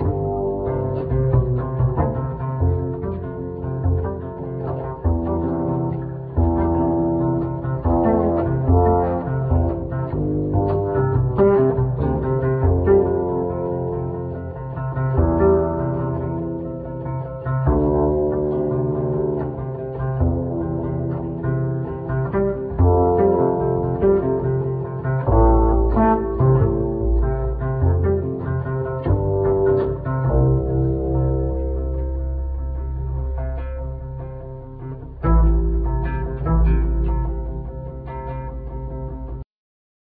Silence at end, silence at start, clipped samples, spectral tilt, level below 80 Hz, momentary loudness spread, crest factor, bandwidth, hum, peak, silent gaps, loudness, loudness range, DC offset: 0.6 s; 0 s; under 0.1%; -14 dB/octave; -26 dBFS; 12 LU; 16 dB; 3.1 kHz; none; -4 dBFS; none; -21 LUFS; 6 LU; under 0.1%